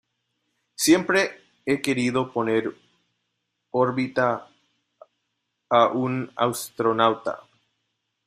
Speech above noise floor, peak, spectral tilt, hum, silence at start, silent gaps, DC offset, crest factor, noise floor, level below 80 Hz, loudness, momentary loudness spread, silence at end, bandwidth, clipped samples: 55 dB; -4 dBFS; -4.5 dB/octave; none; 0.8 s; none; under 0.1%; 22 dB; -78 dBFS; -66 dBFS; -23 LUFS; 13 LU; 0.9 s; 15.5 kHz; under 0.1%